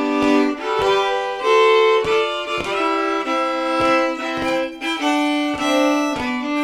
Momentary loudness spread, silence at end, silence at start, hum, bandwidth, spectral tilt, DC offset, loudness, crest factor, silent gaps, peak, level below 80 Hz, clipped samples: 7 LU; 0 s; 0 s; none; 14.5 kHz; -3.5 dB/octave; under 0.1%; -18 LUFS; 14 dB; none; -4 dBFS; -50 dBFS; under 0.1%